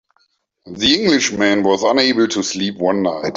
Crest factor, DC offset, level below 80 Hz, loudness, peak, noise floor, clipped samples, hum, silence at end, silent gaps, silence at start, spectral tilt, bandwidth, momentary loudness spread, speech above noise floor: 14 dB; under 0.1%; -52 dBFS; -15 LUFS; -2 dBFS; -63 dBFS; under 0.1%; none; 0 s; none; 0.65 s; -3.5 dB/octave; 7.8 kHz; 5 LU; 47 dB